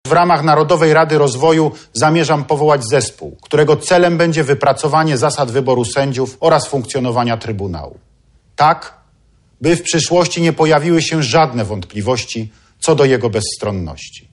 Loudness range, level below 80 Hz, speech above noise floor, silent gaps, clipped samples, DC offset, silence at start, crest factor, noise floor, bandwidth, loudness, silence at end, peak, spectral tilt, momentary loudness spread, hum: 4 LU; -46 dBFS; 39 dB; none; under 0.1%; under 0.1%; 0.05 s; 12 dB; -53 dBFS; 11.5 kHz; -14 LUFS; 0.15 s; -2 dBFS; -5 dB/octave; 11 LU; none